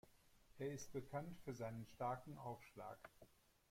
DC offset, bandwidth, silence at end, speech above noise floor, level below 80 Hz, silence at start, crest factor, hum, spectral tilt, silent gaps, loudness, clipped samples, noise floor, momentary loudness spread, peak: under 0.1%; 16.5 kHz; 0.35 s; 20 dB; -74 dBFS; 0.05 s; 18 dB; none; -6 dB/octave; none; -51 LUFS; under 0.1%; -71 dBFS; 9 LU; -34 dBFS